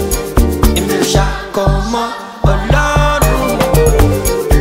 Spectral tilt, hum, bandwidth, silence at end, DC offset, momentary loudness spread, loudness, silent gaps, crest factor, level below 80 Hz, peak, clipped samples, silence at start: -5 dB/octave; none; 16.5 kHz; 0 s; under 0.1%; 6 LU; -13 LUFS; none; 12 dB; -16 dBFS; 0 dBFS; under 0.1%; 0 s